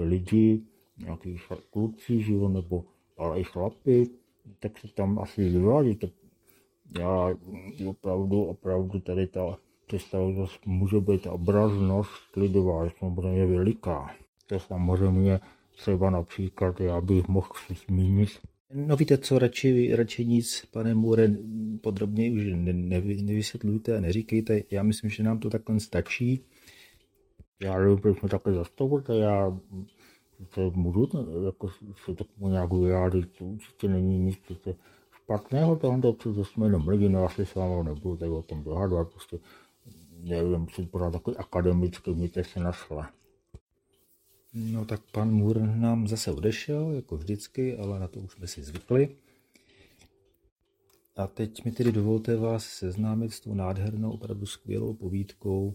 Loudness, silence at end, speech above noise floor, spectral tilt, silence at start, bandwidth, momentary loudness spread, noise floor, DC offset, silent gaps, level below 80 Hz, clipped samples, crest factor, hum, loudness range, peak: -28 LUFS; 0 s; 41 dB; -7.5 dB/octave; 0 s; 15.5 kHz; 14 LU; -68 dBFS; under 0.1%; 14.28-14.33 s, 18.60-18.65 s, 27.48-27.53 s, 43.61-43.67 s, 50.52-50.56 s; -52 dBFS; under 0.1%; 20 dB; none; 6 LU; -8 dBFS